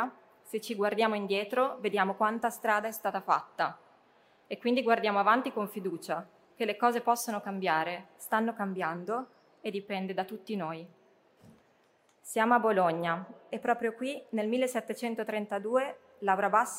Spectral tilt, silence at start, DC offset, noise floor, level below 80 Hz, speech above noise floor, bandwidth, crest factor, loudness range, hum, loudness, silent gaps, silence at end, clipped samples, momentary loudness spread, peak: -4.5 dB/octave; 0 s; under 0.1%; -67 dBFS; -84 dBFS; 37 dB; 16 kHz; 20 dB; 5 LU; none; -31 LUFS; none; 0 s; under 0.1%; 11 LU; -10 dBFS